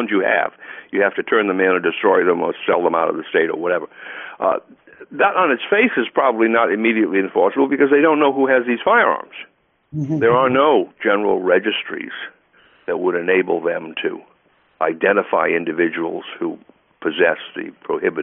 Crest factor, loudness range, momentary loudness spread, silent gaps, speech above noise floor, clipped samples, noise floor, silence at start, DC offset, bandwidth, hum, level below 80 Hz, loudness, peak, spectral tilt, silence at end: 16 dB; 5 LU; 13 LU; none; 40 dB; under 0.1%; -58 dBFS; 0 s; under 0.1%; 3.8 kHz; none; -64 dBFS; -18 LUFS; -2 dBFS; -3 dB/octave; 0 s